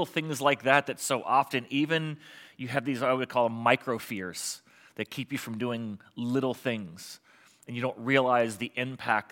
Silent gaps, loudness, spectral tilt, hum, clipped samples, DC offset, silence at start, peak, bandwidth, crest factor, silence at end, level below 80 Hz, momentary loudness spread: none; -29 LUFS; -4.5 dB/octave; none; under 0.1%; under 0.1%; 0 s; -6 dBFS; 17 kHz; 24 dB; 0.1 s; -80 dBFS; 16 LU